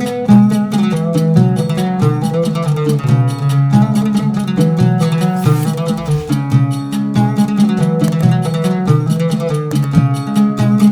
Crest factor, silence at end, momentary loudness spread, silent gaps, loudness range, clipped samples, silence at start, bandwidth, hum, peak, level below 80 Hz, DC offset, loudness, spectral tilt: 12 dB; 0 s; 5 LU; none; 1 LU; 0.1%; 0 s; 15.5 kHz; none; 0 dBFS; -44 dBFS; under 0.1%; -14 LUFS; -7.5 dB/octave